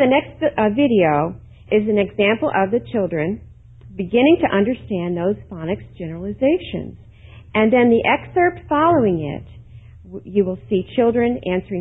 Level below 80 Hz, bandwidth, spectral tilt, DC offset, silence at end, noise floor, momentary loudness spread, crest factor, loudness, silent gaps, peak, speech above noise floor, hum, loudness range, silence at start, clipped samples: -44 dBFS; 4 kHz; -10 dB/octave; under 0.1%; 0 s; -42 dBFS; 14 LU; 16 dB; -19 LUFS; none; -2 dBFS; 24 dB; none; 3 LU; 0 s; under 0.1%